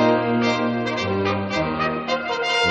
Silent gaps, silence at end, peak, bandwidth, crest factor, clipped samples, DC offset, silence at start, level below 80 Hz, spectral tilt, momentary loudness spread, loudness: none; 0 s; -4 dBFS; 8.8 kHz; 16 dB; under 0.1%; under 0.1%; 0 s; -50 dBFS; -5 dB/octave; 4 LU; -22 LUFS